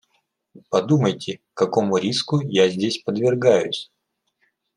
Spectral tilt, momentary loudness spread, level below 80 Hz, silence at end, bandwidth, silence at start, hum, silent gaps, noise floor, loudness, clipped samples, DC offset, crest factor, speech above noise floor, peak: -5.5 dB/octave; 11 LU; -68 dBFS; 0.9 s; 11 kHz; 0.55 s; none; none; -71 dBFS; -21 LUFS; under 0.1%; under 0.1%; 18 dB; 51 dB; -2 dBFS